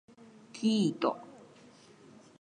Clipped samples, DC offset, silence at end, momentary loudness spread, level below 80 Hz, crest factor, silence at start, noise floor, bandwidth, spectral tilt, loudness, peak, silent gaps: under 0.1%; under 0.1%; 0.95 s; 21 LU; -82 dBFS; 20 dB; 0.55 s; -57 dBFS; 9.6 kHz; -6 dB/octave; -31 LUFS; -16 dBFS; none